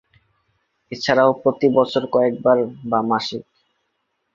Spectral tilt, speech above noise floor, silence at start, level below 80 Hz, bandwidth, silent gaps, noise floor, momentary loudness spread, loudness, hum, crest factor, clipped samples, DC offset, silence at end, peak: -6 dB/octave; 54 dB; 0.9 s; -62 dBFS; 7.6 kHz; none; -72 dBFS; 10 LU; -19 LUFS; none; 20 dB; under 0.1%; under 0.1%; 0.95 s; -2 dBFS